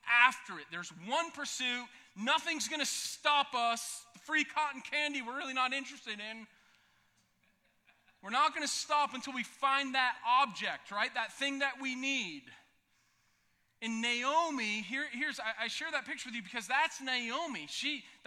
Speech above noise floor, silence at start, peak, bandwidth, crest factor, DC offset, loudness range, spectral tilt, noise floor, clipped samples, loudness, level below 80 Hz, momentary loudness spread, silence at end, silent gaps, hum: 39 dB; 0.05 s; -10 dBFS; 16 kHz; 26 dB; under 0.1%; 5 LU; -1 dB/octave; -75 dBFS; under 0.1%; -34 LUFS; -84 dBFS; 12 LU; 0.1 s; none; none